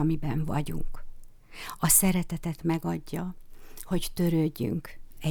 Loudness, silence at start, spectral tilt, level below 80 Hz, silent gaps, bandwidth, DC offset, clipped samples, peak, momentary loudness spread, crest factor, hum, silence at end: -28 LUFS; 0 s; -4.5 dB/octave; -40 dBFS; none; over 20 kHz; under 0.1%; under 0.1%; -8 dBFS; 20 LU; 20 dB; none; 0 s